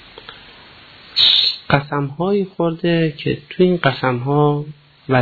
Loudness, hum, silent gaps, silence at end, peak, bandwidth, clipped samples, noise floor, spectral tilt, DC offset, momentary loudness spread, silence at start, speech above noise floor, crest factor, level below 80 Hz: -17 LUFS; none; none; 0 s; -2 dBFS; 4.8 kHz; under 0.1%; -43 dBFS; -7.5 dB/octave; under 0.1%; 13 LU; 0.15 s; 25 dB; 16 dB; -50 dBFS